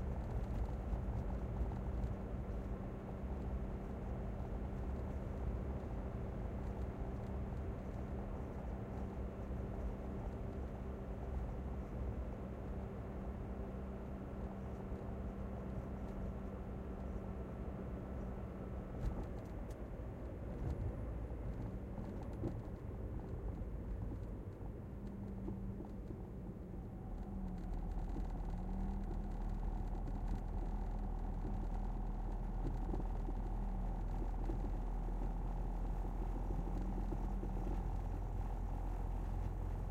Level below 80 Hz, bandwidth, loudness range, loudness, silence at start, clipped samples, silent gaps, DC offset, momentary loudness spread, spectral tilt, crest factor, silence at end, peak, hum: -44 dBFS; 7.4 kHz; 3 LU; -45 LUFS; 0 s; under 0.1%; none; under 0.1%; 4 LU; -9 dB/octave; 14 dB; 0 s; -28 dBFS; none